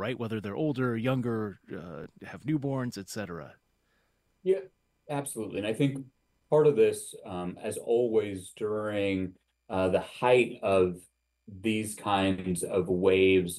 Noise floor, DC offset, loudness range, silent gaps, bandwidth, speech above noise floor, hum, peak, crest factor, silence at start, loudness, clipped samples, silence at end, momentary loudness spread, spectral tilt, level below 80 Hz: -72 dBFS; under 0.1%; 7 LU; none; 14 kHz; 44 dB; none; -10 dBFS; 18 dB; 0 s; -29 LUFS; under 0.1%; 0 s; 15 LU; -5.5 dB/octave; -64 dBFS